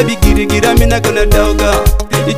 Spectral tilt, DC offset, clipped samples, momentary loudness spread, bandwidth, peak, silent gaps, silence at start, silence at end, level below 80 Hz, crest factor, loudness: -5 dB/octave; 4%; 0.5%; 3 LU; 16.5 kHz; 0 dBFS; none; 0 s; 0 s; -14 dBFS; 10 dB; -11 LUFS